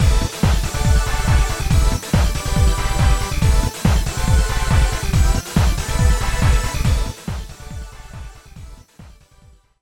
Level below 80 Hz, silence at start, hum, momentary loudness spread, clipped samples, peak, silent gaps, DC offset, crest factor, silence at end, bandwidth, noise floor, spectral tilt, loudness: -20 dBFS; 0 s; none; 15 LU; under 0.1%; -2 dBFS; none; under 0.1%; 14 dB; 0.7 s; 17 kHz; -49 dBFS; -5 dB/octave; -19 LUFS